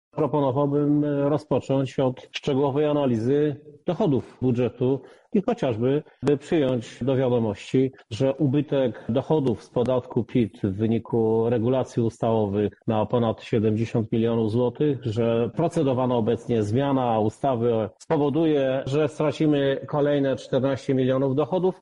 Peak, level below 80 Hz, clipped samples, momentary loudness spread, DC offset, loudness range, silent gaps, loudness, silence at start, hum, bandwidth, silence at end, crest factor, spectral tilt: -8 dBFS; -56 dBFS; under 0.1%; 4 LU; under 0.1%; 1 LU; none; -24 LUFS; 0.15 s; none; 11 kHz; 0.1 s; 14 dB; -8 dB/octave